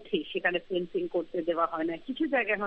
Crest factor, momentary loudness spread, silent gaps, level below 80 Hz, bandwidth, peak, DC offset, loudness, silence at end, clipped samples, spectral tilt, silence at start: 18 dB; 5 LU; none; -62 dBFS; 5 kHz; -12 dBFS; under 0.1%; -30 LUFS; 0 s; under 0.1%; -7.5 dB/octave; 0 s